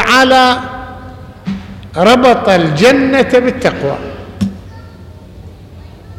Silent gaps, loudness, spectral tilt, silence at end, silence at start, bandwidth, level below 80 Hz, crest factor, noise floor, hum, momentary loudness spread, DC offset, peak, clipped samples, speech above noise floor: none; -10 LUFS; -5 dB/octave; 0.05 s; 0 s; 16.5 kHz; -38 dBFS; 12 dB; -33 dBFS; none; 20 LU; under 0.1%; 0 dBFS; under 0.1%; 24 dB